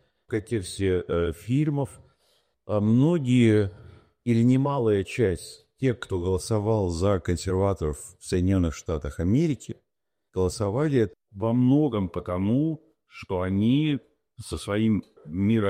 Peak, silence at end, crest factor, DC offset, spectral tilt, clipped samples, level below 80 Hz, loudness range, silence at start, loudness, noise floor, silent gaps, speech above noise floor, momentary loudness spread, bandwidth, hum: -10 dBFS; 0 s; 16 dB; under 0.1%; -7 dB/octave; under 0.1%; -46 dBFS; 3 LU; 0.3 s; -25 LUFS; -84 dBFS; none; 60 dB; 13 LU; 15 kHz; none